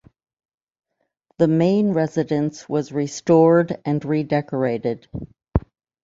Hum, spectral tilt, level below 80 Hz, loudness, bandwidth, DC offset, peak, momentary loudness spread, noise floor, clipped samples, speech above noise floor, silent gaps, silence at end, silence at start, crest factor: none; -7.5 dB/octave; -40 dBFS; -20 LUFS; 7.8 kHz; under 0.1%; -2 dBFS; 10 LU; -68 dBFS; under 0.1%; 49 dB; none; 0.45 s; 1.4 s; 18 dB